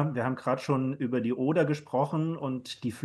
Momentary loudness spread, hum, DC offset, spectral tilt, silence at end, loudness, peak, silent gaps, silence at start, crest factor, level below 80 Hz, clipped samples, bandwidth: 7 LU; none; under 0.1%; -7.5 dB/octave; 0 s; -30 LUFS; -12 dBFS; none; 0 s; 16 dB; -72 dBFS; under 0.1%; 12.5 kHz